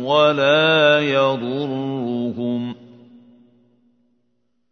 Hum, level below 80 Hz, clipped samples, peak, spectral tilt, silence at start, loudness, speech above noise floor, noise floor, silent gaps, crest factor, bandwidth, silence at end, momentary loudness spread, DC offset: none; -68 dBFS; under 0.1%; -2 dBFS; -6 dB/octave; 0 s; -18 LUFS; 53 dB; -70 dBFS; none; 18 dB; 6.6 kHz; 2 s; 11 LU; under 0.1%